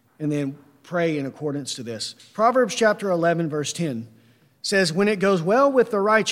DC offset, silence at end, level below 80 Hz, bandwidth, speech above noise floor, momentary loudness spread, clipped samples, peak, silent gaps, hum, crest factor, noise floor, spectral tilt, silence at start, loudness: under 0.1%; 0 s; -70 dBFS; 16 kHz; 35 dB; 12 LU; under 0.1%; -4 dBFS; none; none; 18 dB; -56 dBFS; -4.5 dB/octave; 0.2 s; -22 LUFS